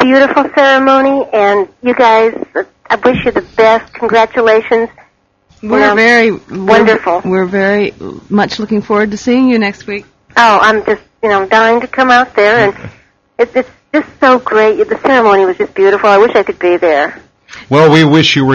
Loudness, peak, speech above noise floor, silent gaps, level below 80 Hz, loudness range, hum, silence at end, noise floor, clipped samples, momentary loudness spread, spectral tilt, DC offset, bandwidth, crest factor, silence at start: -9 LUFS; 0 dBFS; 42 dB; none; -46 dBFS; 2 LU; none; 0 s; -51 dBFS; 0.4%; 9 LU; -5.5 dB/octave; under 0.1%; 8.4 kHz; 10 dB; 0 s